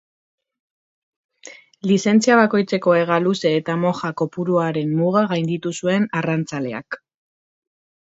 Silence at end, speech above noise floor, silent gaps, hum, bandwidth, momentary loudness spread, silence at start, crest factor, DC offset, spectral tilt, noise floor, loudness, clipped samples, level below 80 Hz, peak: 1.15 s; 25 dB; none; none; 8 kHz; 11 LU; 1.45 s; 20 dB; under 0.1%; -6 dB/octave; -44 dBFS; -19 LUFS; under 0.1%; -66 dBFS; 0 dBFS